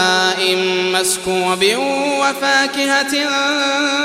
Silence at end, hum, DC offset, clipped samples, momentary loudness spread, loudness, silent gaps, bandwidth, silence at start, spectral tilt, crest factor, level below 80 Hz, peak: 0 s; none; under 0.1%; under 0.1%; 3 LU; -15 LUFS; none; 16 kHz; 0 s; -2 dB/octave; 14 dB; -56 dBFS; -2 dBFS